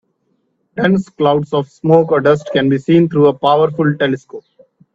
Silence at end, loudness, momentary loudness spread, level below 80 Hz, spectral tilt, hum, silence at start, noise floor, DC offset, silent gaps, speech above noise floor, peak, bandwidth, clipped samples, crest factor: 0.55 s; -14 LUFS; 9 LU; -54 dBFS; -8 dB/octave; none; 0.75 s; -64 dBFS; under 0.1%; none; 51 dB; 0 dBFS; 7.8 kHz; under 0.1%; 14 dB